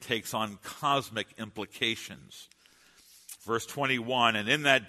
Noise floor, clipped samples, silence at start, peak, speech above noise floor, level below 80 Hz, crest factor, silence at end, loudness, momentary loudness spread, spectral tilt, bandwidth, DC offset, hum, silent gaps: -61 dBFS; under 0.1%; 0 s; -6 dBFS; 31 dB; -70 dBFS; 24 dB; 0 s; -30 LUFS; 20 LU; -3 dB/octave; 13.5 kHz; under 0.1%; none; none